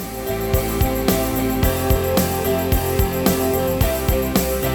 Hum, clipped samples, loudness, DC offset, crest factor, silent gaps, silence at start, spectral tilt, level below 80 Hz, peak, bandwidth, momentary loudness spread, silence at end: none; under 0.1%; -19 LUFS; under 0.1%; 16 dB; none; 0 s; -5.5 dB/octave; -26 dBFS; -4 dBFS; over 20 kHz; 2 LU; 0 s